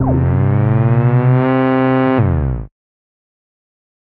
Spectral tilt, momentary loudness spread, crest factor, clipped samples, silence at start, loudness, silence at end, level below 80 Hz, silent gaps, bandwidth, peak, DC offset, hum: -12.5 dB/octave; 5 LU; 12 dB; under 0.1%; 0 s; -14 LUFS; 1.35 s; -30 dBFS; none; 4 kHz; -2 dBFS; under 0.1%; none